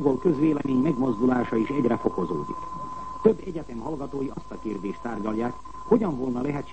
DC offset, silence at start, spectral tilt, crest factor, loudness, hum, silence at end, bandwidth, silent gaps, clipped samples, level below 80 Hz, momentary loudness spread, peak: 0.9%; 0 s; -8.5 dB/octave; 20 dB; -26 LUFS; none; 0 s; 8.6 kHz; none; under 0.1%; -50 dBFS; 11 LU; -6 dBFS